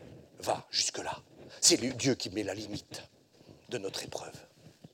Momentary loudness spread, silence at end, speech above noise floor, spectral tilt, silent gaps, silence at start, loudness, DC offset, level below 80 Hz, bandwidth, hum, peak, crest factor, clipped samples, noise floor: 21 LU; 0.25 s; 25 dB; -2 dB/octave; none; 0 s; -31 LUFS; under 0.1%; -68 dBFS; 18 kHz; none; -8 dBFS; 26 dB; under 0.1%; -58 dBFS